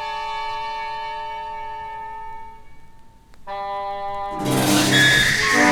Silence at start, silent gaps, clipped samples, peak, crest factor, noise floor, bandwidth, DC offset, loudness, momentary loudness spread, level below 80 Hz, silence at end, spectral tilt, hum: 0 s; none; under 0.1%; -2 dBFS; 20 dB; -44 dBFS; over 20 kHz; under 0.1%; -20 LUFS; 20 LU; -46 dBFS; 0 s; -3 dB/octave; none